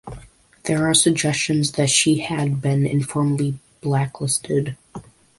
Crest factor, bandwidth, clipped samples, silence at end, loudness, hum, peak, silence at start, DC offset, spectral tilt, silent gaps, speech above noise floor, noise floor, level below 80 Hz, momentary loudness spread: 20 dB; 11.5 kHz; under 0.1%; 0.4 s; -20 LUFS; none; -2 dBFS; 0.05 s; under 0.1%; -4 dB/octave; none; 25 dB; -45 dBFS; -52 dBFS; 15 LU